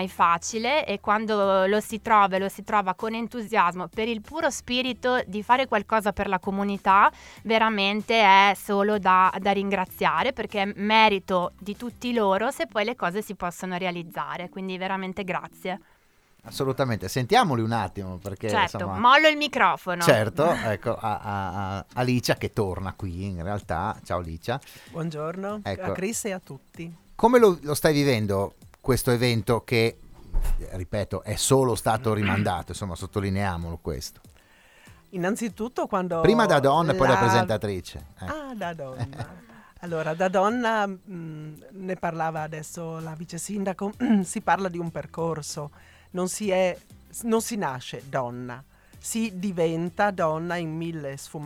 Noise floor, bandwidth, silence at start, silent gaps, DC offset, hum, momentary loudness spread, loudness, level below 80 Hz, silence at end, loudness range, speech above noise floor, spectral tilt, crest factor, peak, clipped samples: -60 dBFS; 18 kHz; 0 s; none; under 0.1%; none; 15 LU; -25 LUFS; -44 dBFS; 0 s; 9 LU; 36 dB; -5 dB/octave; 22 dB; -4 dBFS; under 0.1%